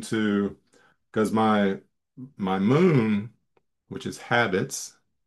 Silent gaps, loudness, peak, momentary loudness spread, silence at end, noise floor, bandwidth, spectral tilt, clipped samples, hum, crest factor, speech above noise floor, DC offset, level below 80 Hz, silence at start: none; -24 LUFS; -6 dBFS; 16 LU; 0.35 s; -71 dBFS; 12.5 kHz; -6 dB/octave; under 0.1%; none; 20 dB; 48 dB; under 0.1%; -68 dBFS; 0 s